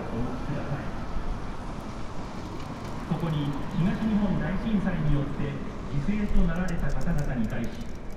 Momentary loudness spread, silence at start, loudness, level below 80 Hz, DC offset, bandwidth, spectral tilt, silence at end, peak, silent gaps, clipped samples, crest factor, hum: 11 LU; 0 s; -30 LUFS; -32 dBFS; under 0.1%; 10.5 kHz; -7.5 dB/octave; 0 s; -10 dBFS; none; under 0.1%; 16 dB; none